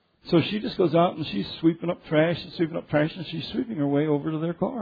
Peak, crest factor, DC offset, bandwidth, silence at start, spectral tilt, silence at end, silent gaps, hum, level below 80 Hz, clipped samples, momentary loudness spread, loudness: -8 dBFS; 16 dB; under 0.1%; 5 kHz; 0.25 s; -9 dB/octave; 0 s; none; none; -58 dBFS; under 0.1%; 7 LU; -25 LUFS